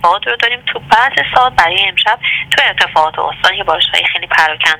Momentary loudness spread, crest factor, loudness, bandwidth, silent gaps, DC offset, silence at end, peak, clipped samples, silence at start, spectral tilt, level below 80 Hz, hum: 3 LU; 12 dB; -11 LUFS; 19 kHz; none; under 0.1%; 0 s; 0 dBFS; 0.3%; 0 s; -1.5 dB/octave; -44 dBFS; none